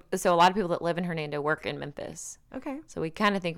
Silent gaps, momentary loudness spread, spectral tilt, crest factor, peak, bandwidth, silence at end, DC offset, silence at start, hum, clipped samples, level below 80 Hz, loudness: none; 16 LU; -4.5 dB/octave; 18 dB; -12 dBFS; 17.5 kHz; 0 s; under 0.1%; 0.1 s; none; under 0.1%; -58 dBFS; -28 LUFS